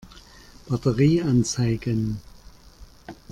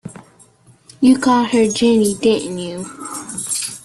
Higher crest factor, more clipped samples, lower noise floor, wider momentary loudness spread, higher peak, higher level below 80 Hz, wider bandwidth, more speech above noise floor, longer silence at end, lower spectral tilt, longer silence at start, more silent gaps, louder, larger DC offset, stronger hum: about the same, 18 dB vs 16 dB; neither; about the same, -48 dBFS vs -49 dBFS; first, 17 LU vs 14 LU; second, -8 dBFS vs -2 dBFS; first, -46 dBFS vs -54 dBFS; about the same, 13 kHz vs 12.5 kHz; second, 26 dB vs 35 dB; about the same, 0.15 s vs 0.05 s; first, -6.5 dB/octave vs -4 dB/octave; about the same, 0.1 s vs 0.05 s; neither; second, -23 LUFS vs -16 LUFS; neither; neither